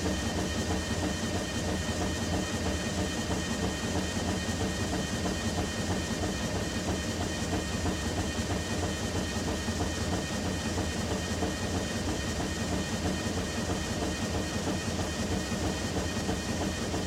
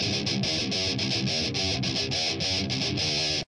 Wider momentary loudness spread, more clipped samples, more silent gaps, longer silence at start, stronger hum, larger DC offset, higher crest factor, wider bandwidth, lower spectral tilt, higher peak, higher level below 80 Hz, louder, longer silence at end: about the same, 1 LU vs 1 LU; neither; neither; about the same, 0 s vs 0 s; neither; neither; about the same, 14 dB vs 12 dB; first, 16.5 kHz vs 11 kHz; about the same, -4.5 dB/octave vs -3.5 dB/octave; second, -18 dBFS vs -14 dBFS; first, -42 dBFS vs -54 dBFS; second, -32 LUFS vs -26 LUFS; about the same, 0 s vs 0.1 s